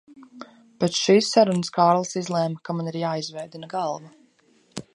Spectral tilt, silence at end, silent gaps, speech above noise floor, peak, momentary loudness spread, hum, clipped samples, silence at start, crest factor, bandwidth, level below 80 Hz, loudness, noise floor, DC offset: -5 dB/octave; 0.15 s; none; 38 dB; -4 dBFS; 19 LU; none; under 0.1%; 0.1 s; 20 dB; 11.5 kHz; -70 dBFS; -23 LUFS; -61 dBFS; under 0.1%